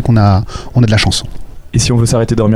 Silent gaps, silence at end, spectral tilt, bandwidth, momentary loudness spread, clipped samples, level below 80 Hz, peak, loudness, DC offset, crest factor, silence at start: none; 0 s; -5.5 dB/octave; 13.5 kHz; 8 LU; under 0.1%; -26 dBFS; 0 dBFS; -12 LUFS; under 0.1%; 10 dB; 0 s